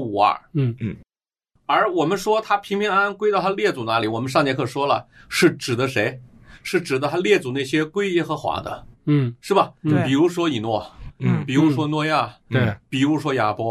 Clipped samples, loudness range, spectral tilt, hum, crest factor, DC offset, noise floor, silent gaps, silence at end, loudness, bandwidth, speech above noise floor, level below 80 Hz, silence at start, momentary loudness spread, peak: under 0.1%; 1 LU; -6 dB/octave; none; 18 dB; under 0.1%; -72 dBFS; none; 0 s; -21 LUFS; 13.5 kHz; 51 dB; -54 dBFS; 0 s; 7 LU; -4 dBFS